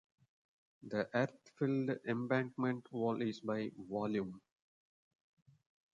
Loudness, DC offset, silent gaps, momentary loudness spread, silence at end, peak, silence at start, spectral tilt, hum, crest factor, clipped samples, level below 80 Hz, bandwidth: -39 LUFS; under 0.1%; none; 6 LU; 1.6 s; -20 dBFS; 0.85 s; -7.5 dB/octave; none; 20 dB; under 0.1%; -78 dBFS; 7.6 kHz